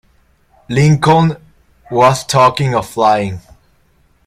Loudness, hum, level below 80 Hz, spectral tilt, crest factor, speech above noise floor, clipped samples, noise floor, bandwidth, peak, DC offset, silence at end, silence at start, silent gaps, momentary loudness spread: -13 LUFS; none; -44 dBFS; -6 dB/octave; 14 dB; 42 dB; under 0.1%; -54 dBFS; 15 kHz; 0 dBFS; under 0.1%; 0.85 s; 0.7 s; none; 11 LU